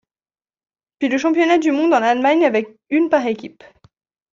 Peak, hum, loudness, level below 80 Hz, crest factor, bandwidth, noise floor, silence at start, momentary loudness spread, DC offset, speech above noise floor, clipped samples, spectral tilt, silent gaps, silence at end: -2 dBFS; none; -17 LUFS; -66 dBFS; 16 dB; 7.6 kHz; under -90 dBFS; 1 s; 9 LU; under 0.1%; over 74 dB; under 0.1%; -4.5 dB/octave; none; 0.85 s